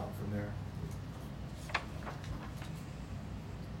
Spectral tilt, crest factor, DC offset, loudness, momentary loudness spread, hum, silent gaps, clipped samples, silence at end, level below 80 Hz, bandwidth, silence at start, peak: -6 dB/octave; 24 dB; under 0.1%; -43 LUFS; 6 LU; none; none; under 0.1%; 0 s; -50 dBFS; 16 kHz; 0 s; -18 dBFS